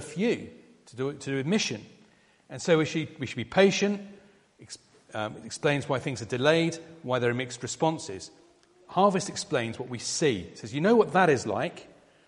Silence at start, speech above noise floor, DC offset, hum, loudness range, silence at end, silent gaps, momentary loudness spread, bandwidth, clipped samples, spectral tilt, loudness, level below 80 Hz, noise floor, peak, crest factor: 0 s; 33 dB; under 0.1%; none; 4 LU; 0.4 s; none; 18 LU; 11.5 kHz; under 0.1%; -4.5 dB/octave; -27 LUFS; -66 dBFS; -61 dBFS; -8 dBFS; 20 dB